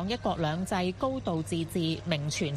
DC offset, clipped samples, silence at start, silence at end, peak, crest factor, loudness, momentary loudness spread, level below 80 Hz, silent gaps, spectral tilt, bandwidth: under 0.1%; under 0.1%; 0 s; 0 s; -10 dBFS; 20 dB; -31 LUFS; 2 LU; -52 dBFS; none; -5.5 dB/octave; 14 kHz